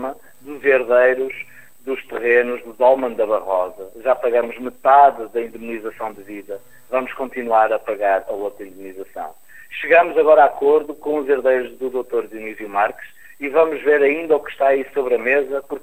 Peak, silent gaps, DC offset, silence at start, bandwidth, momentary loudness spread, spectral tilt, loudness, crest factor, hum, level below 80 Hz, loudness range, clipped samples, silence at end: 0 dBFS; none; 0.7%; 0 s; 15.5 kHz; 19 LU; -5 dB/octave; -18 LUFS; 18 dB; none; -60 dBFS; 5 LU; under 0.1%; 0.05 s